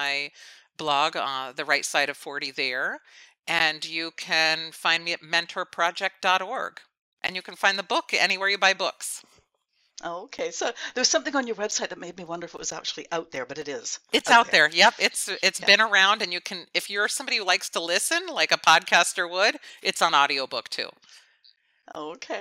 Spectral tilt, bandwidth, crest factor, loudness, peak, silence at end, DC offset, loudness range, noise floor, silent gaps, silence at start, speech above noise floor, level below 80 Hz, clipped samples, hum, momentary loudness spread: -0.5 dB/octave; 16 kHz; 22 dB; -23 LUFS; -4 dBFS; 0 s; under 0.1%; 8 LU; -71 dBFS; 7.02-7.17 s; 0 s; 46 dB; -74 dBFS; under 0.1%; none; 16 LU